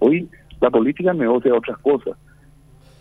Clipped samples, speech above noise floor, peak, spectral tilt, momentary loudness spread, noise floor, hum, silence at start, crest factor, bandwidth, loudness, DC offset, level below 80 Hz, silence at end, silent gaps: under 0.1%; 30 dB; -2 dBFS; -9 dB/octave; 6 LU; -48 dBFS; none; 0 s; 18 dB; 4 kHz; -19 LUFS; under 0.1%; -50 dBFS; 0.9 s; none